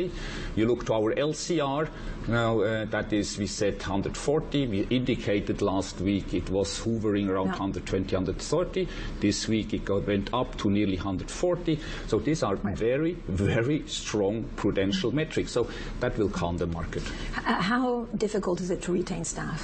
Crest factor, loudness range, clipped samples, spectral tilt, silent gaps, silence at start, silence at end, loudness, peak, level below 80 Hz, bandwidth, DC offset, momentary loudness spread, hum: 14 dB; 1 LU; under 0.1%; -5.5 dB/octave; none; 0 s; 0 s; -28 LUFS; -12 dBFS; -42 dBFS; 8.8 kHz; under 0.1%; 5 LU; none